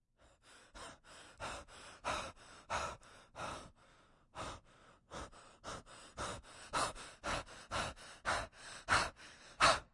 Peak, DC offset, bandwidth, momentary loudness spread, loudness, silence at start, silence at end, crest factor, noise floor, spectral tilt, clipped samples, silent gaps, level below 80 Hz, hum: -16 dBFS; under 0.1%; 11.5 kHz; 21 LU; -41 LUFS; 0.45 s; 0.1 s; 28 dB; -68 dBFS; -2 dB/octave; under 0.1%; none; -60 dBFS; none